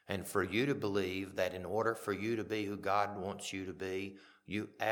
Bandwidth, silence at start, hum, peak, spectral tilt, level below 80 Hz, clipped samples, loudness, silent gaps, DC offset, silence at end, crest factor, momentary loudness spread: 19 kHz; 0.1 s; none; -18 dBFS; -5 dB/octave; -72 dBFS; under 0.1%; -37 LUFS; none; under 0.1%; 0 s; 20 dB; 8 LU